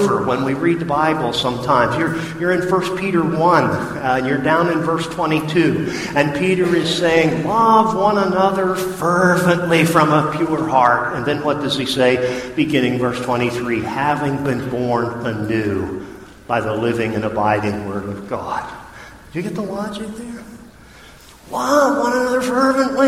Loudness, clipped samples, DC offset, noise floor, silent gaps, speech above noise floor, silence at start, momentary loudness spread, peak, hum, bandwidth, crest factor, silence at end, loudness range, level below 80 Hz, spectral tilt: -17 LUFS; under 0.1%; under 0.1%; -42 dBFS; none; 25 dB; 0 s; 11 LU; 0 dBFS; none; 15.5 kHz; 18 dB; 0 s; 7 LU; -48 dBFS; -5.5 dB/octave